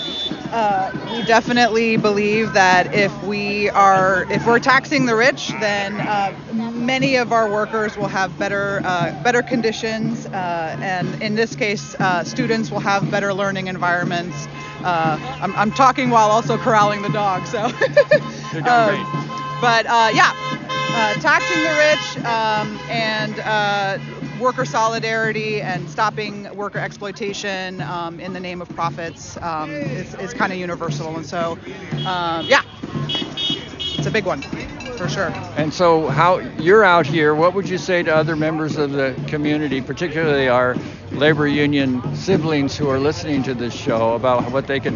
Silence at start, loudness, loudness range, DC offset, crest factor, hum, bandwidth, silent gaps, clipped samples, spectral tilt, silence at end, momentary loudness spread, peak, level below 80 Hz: 0 s; -18 LUFS; 8 LU; under 0.1%; 18 dB; none; 7.4 kHz; none; under 0.1%; -3.5 dB/octave; 0 s; 11 LU; -2 dBFS; -50 dBFS